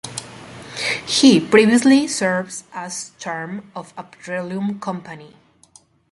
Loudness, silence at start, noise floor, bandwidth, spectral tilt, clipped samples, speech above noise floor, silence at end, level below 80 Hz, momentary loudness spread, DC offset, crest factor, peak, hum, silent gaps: -18 LUFS; 0.05 s; -52 dBFS; 11.5 kHz; -4 dB/octave; under 0.1%; 34 dB; 0.85 s; -60 dBFS; 23 LU; under 0.1%; 20 dB; 0 dBFS; none; none